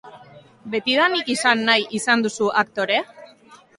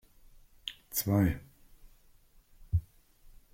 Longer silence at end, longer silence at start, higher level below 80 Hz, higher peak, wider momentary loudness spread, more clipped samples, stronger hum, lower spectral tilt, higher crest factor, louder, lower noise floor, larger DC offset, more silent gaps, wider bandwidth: second, 0.25 s vs 0.75 s; second, 0.05 s vs 0.65 s; second, -68 dBFS vs -48 dBFS; first, -2 dBFS vs -16 dBFS; second, 6 LU vs 15 LU; neither; neither; second, -2.5 dB/octave vs -5.5 dB/octave; about the same, 20 dB vs 20 dB; first, -19 LUFS vs -33 LUFS; second, -49 dBFS vs -61 dBFS; neither; neither; second, 11.5 kHz vs 16.5 kHz